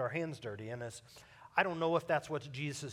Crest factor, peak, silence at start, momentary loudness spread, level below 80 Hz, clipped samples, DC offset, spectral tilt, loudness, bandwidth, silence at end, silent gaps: 24 dB; -14 dBFS; 0 s; 17 LU; -74 dBFS; under 0.1%; under 0.1%; -5 dB/octave; -37 LUFS; 15.5 kHz; 0 s; none